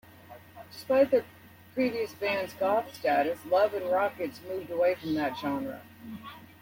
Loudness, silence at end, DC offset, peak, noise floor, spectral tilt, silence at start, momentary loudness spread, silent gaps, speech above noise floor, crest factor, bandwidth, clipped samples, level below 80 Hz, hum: -29 LUFS; 0.15 s; under 0.1%; -12 dBFS; -51 dBFS; -5.5 dB/octave; 0.3 s; 19 LU; none; 22 dB; 18 dB; 16.5 kHz; under 0.1%; -68 dBFS; none